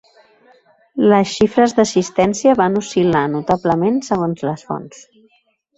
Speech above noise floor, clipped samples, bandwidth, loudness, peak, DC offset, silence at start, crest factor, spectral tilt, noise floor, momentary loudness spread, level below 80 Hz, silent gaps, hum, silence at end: 45 dB; under 0.1%; 8.2 kHz; -16 LUFS; -2 dBFS; under 0.1%; 0.95 s; 16 dB; -5.5 dB/octave; -61 dBFS; 10 LU; -50 dBFS; none; none; 0.9 s